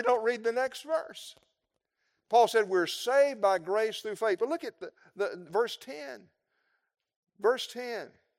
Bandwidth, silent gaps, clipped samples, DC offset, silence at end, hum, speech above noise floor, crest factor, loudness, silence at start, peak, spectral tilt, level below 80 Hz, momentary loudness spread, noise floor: 16 kHz; 7.16-7.23 s; under 0.1%; under 0.1%; 0.3 s; none; 54 dB; 20 dB; -29 LUFS; 0 s; -12 dBFS; -3 dB/octave; -86 dBFS; 18 LU; -83 dBFS